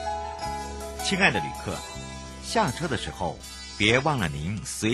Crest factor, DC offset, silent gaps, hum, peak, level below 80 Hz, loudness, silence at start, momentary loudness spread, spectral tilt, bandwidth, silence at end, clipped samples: 22 dB; under 0.1%; none; none; -6 dBFS; -44 dBFS; -27 LUFS; 0 s; 15 LU; -4 dB/octave; 12.5 kHz; 0 s; under 0.1%